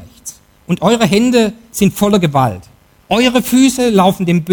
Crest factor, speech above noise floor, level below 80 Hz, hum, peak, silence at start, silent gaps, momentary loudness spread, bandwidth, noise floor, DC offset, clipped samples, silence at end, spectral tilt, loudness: 12 dB; 23 dB; -42 dBFS; none; 0 dBFS; 0 s; none; 12 LU; 19.5 kHz; -35 dBFS; under 0.1%; under 0.1%; 0 s; -5 dB/octave; -13 LUFS